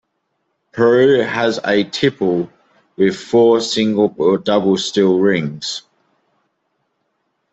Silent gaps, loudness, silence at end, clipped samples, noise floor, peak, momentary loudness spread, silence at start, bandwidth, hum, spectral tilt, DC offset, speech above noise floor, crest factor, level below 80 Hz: none; -15 LUFS; 1.75 s; under 0.1%; -70 dBFS; -2 dBFS; 10 LU; 0.75 s; 8.2 kHz; none; -5 dB/octave; under 0.1%; 55 dB; 14 dB; -60 dBFS